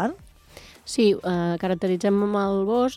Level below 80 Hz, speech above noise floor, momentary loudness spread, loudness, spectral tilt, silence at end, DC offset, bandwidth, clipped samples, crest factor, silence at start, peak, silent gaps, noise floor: -54 dBFS; 26 dB; 9 LU; -23 LUFS; -6 dB/octave; 0 s; under 0.1%; 14 kHz; under 0.1%; 14 dB; 0 s; -8 dBFS; none; -48 dBFS